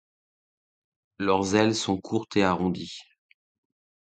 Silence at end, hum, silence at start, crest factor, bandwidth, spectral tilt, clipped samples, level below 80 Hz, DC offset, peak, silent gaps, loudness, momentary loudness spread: 1.1 s; none; 1.2 s; 20 dB; 9.4 kHz; -5 dB/octave; under 0.1%; -56 dBFS; under 0.1%; -8 dBFS; none; -25 LUFS; 12 LU